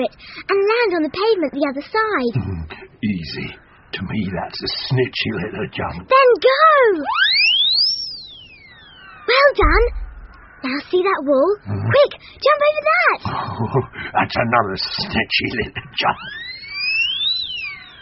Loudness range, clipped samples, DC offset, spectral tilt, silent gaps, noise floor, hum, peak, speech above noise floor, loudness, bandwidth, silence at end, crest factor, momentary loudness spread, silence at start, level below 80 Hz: 9 LU; under 0.1%; under 0.1%; -2 dB/octave; none; -43 dBFS; none; 0 dBFS; 26 dB; -17 LUFS; 6 kHz; 0 s; 18 dB; 15 LU; 0 s; -34 dBFS